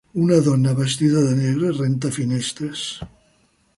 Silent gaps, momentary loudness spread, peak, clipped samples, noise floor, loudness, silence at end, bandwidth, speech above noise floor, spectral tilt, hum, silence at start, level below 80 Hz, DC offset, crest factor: none; 12 LU; -4 dBFS; under 0.1%; -61 dBFS; -20 LUFS; 0.7 s; 11.5 kHz; 42 dB; -6 dB/octave; none; 0.15 s; -54 dBFS; under 0.1%; 16 dB